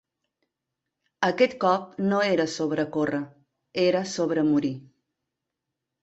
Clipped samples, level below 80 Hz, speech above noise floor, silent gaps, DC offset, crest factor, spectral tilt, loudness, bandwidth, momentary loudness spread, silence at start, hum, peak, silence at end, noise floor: under 0.1%; -68 dBFS; 60 dB; none; under 0.1%; 20 dB; -5.5 dB/octave; -25 LUFS; 8.2 kHz; 10 LU; 1.2 s; none; -6 dBFS; 1.2 s; -84 dBFS